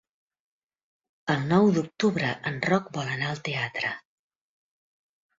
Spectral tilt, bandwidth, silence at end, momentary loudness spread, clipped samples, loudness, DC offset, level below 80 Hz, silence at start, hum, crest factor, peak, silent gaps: -6 dB/octave; 7.8 kHz; 1.4 s; 10 LU; under 0.1%; -26 LUFS; under 0.1%; -64 dBFS; 1.25 s; none; 20 dB; -8 dBFS; none